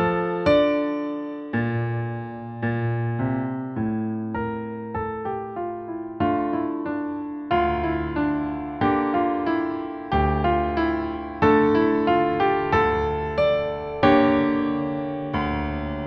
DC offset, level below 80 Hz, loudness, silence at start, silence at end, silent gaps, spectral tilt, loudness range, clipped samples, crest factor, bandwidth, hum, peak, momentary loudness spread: under 0.1%; -40 dBFS; -24 LUFS; 0 s; 0 s; none; -9 dB/octave; 7 LU; under 0.1%; 18 dB; 6.2 kHz; none; -4 dBFS; 11 LU